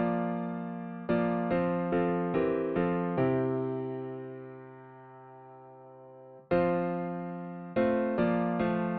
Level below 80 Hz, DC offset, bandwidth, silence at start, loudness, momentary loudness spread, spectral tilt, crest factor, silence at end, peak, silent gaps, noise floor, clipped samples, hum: -60 dBFS; under 0.1%; 4.6 kHz; 0 s; -31 LUFS; 22 LU; -7.5 dB/octave; 18 dB; 0 s; -14 dBFS; none; -51 dBFS; under 0.1%; none